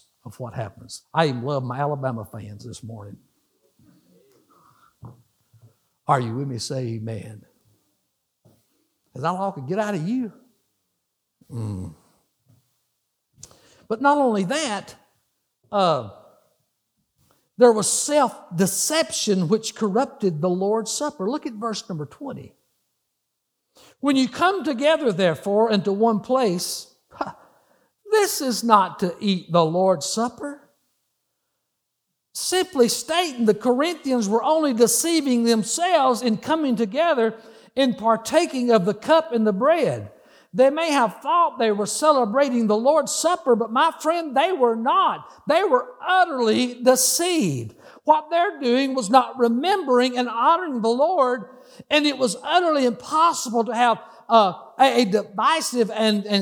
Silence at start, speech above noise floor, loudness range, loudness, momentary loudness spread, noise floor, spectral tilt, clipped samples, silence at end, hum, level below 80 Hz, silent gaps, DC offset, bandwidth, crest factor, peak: 0.25 s; 58 dB; 10 LU; -21 LUFS; 14 LU; -78 dBFS; -4 dB/octave; under 0.1%; 0 s; none; -68 dBFS; none; under 0.1%; over 20 kHz; 20 dB; -2 dBFS